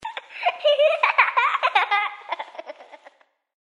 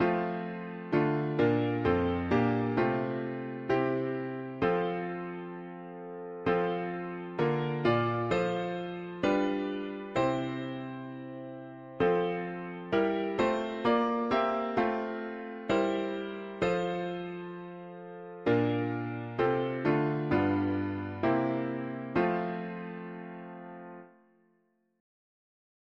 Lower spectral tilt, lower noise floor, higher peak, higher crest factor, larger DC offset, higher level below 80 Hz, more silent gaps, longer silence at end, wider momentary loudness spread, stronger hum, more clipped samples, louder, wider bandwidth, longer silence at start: second, 0 dB/octave vs -8 dB/octave; second, -54 dBFS vs -73 dBFS; first, 0 dBFS vs -14 dBFS; about the same, 22 dB vs 18 dB; neither; second, -78 dBFS vs -60 dBFS; neither; second, 0.7 s vs 1.9 s; first, 17 LU vs 14 LU; neither; neither; first, -20 LUFS vs -31 LUFS; first, 11 kHz vs 7.4 kHz; about the same, 0 s vs 0 s